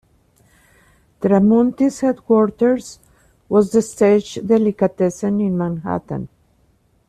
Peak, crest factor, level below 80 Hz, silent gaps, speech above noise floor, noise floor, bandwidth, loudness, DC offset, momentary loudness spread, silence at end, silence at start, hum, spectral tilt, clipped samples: -4 dBFS; 14 dB; -54 dBFS; none; 42 dB; -59 dBFS; 12.5 kHz; -17 LUFS; under 0.1%; 10 LU; 0.8 s; 1.2 s; none; -7.5 dB/octave; under 0.1%